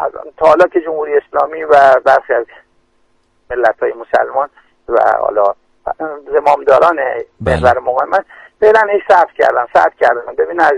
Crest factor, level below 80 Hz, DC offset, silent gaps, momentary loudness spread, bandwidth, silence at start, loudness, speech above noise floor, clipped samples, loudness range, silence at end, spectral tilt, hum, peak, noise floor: 12 dB; -40 dBFS; under 0.1%; none; 11 LU; 10.5 kHz; 0 s; -12 LUFS; 44 dB; 0.1%; 4 LU; 0 s; -6 dB/octave; none; 0 dBFS; -56 dBFS